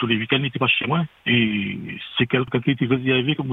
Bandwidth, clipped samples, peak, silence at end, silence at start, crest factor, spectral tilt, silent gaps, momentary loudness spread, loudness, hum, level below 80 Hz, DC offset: 4.1 kHz; under 0.1%; -4 dBFS; 0 s; 0 s; 18 dB; -8.5 dB/octave; none; 6 LU; -21 LUFS; none; -58 dBFS; under 0.1%